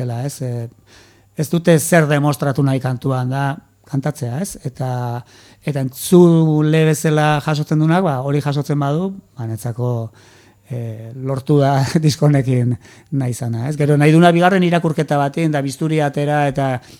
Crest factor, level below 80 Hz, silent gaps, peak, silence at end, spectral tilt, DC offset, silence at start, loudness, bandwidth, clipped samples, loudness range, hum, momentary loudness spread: 16 dB; -54 dBFS; none; 0 dBFS; 0.05 s; -6.5 dB/octave; under 0.1%; 0 s; -17 LUFS; 16.5 kHz; under 0.1%; 6 LU; none; 14 LU